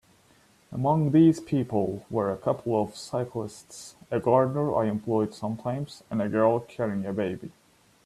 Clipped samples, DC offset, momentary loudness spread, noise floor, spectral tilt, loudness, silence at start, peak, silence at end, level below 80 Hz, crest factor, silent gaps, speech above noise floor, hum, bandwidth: under 0.1%; under 0.1%; 14 LU; -60 dBFS; -8 dB/octave; -27 LUFS; 0.7 s; -8 dBFS; 0.55 s; -62 dBFS; 18 dB; none; 34 dB; none; 13 kHz